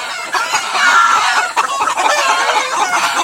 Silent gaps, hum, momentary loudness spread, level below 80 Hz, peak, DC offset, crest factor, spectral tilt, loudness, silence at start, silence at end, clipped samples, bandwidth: none; none; 6 LU; -62 dBFS; 0 dBFS; under 0.1%; 14 dB; 1 dB/octave; -13 LUFS; 0 s; 0 s; under 0.1%; 16.5 kHz